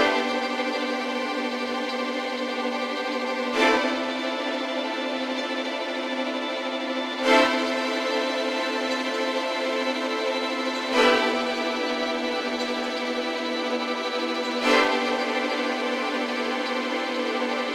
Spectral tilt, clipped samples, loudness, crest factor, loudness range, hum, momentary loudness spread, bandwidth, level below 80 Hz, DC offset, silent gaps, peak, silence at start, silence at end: -2 dB/octave; under 0.1%; -25 LUFS; 20 dB; 2 LU; none; 7 LU; 15.5 kHz; -66 dBFS; under 0.1%; none; -4 dBFS; 0 s; 0 s